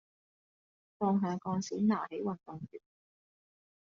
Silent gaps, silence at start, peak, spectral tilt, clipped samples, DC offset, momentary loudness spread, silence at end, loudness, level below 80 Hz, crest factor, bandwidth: none; 1 s; -18 dBFS; -7.5 dB/octave; under 0.1%; under 0.1%; 16 LU; 1.05 s; -34 LUFS; -78 dBFS; 18 dB; 7.4 kHz